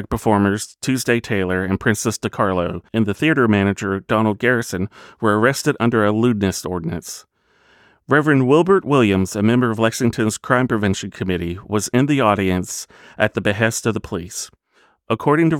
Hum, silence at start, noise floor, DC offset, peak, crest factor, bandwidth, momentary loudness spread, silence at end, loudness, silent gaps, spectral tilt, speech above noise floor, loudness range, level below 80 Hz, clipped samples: none; 0 s; -58 dBFS; under 0.1%; -2 dBFS; 18 dB; 17 kHz; 11 LU; 0 s; -18 LUFS; none; -5.5 dB/octave; 40 dB; 3 LU; -48 dBFS; under 0.1%